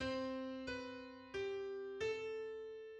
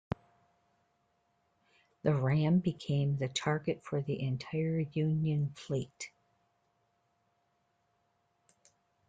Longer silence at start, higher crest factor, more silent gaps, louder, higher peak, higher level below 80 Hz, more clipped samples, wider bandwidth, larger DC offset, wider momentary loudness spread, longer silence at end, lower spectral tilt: second, 0 s vs 2.05 s; about the same, 14 dB vs 18 dB; neither; second, -45 LUFS vs -33 LUFS; second, -30 dBFS vs -18 dBFS; about the same, -68 dBFS vs -66 dBFS; neither; about the same, 9.2 kHz vs 9.2 kHz; neither; second, 7 LU vs 11 LU; second, 0 s vs 3 s; second, -5 dB/octave vs -7 dB/octave